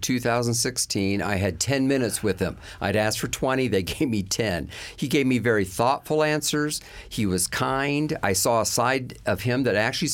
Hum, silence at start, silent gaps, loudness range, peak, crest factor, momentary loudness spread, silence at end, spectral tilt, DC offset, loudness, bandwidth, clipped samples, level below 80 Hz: none; 0 s; none; 1 LU; -8 dBFS; 16 dB; 7 LU; 0 s; -4 dB/octave; under 0.1%; -24 LUFS; 17 kHz; under 0.1%; -48 dBFS